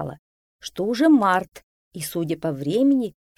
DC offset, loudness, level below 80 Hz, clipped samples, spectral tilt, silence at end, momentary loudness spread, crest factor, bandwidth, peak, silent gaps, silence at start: under 0.1%; -21 LUFS; -60 dBFS; under 0.1%; -5.5 dB/octave; 0.25 s; 19 LU; 16 dB; 15.5 kHz; -6 dBFS; 0.19-0.59 s, 1.63-1.91 s; 0 s